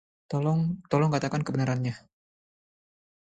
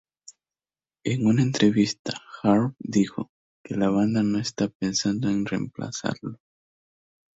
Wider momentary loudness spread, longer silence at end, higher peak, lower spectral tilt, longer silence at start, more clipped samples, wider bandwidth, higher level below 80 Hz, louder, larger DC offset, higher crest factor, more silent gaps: second, 9 LU vs 13 LU; first, 1.25 s vs 1.05 s; about the same, -10 dBFS vs -8 dBFS; first, -7.5 dB/octave vs -5.5 dB/octave; second, 0.3 s vs 1.05 s; neither; first, 9 kHz vs 8 kHz; about the same, -60 dBFS vs -60 dBFS; second, -28 LUFS vs -25 LUFS; neither; about the same, 20 dB vs 18 dB; second, none vs 1.99-2.05 s, 3.29-3.64 s, 4.75-4.80 s